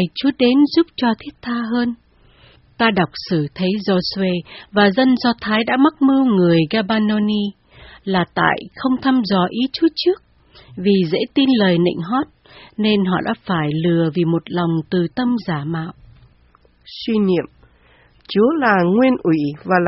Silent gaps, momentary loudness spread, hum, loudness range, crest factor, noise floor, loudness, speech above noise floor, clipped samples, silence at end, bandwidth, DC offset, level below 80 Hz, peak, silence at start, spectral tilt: none; 10 LU; none; 5 LU; 18 dB; -53 dBFS; -17 LUFS; 36 dB; under 0.1%; 0 s; 6 kHz; under 0.1%; -52 dBFS; 0 dBFS; 0 s; -4.5 dB/octave